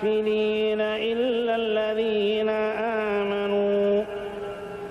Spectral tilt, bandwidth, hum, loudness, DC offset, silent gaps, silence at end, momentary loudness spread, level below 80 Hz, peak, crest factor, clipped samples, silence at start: -6.5 dB/octave; 6.2 kHz; none; -25 LUFS; under 0.1%; none; 0 s; 9 LU; -58 dBFS; -14 dBFS; 10 dB; under 0.1%; 0 s